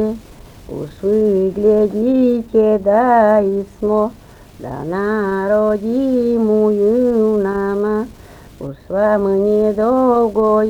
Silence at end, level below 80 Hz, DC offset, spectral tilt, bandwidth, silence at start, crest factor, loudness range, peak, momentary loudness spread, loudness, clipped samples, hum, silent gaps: 0 s; -44 dBFS; under 0.1%; -8.5 dB/octave; 10.5 kHz; 0 s; 14 dB; 2 LU; 0 dBFS; 14 LU; -15 LUFS; under 0.1%; none; none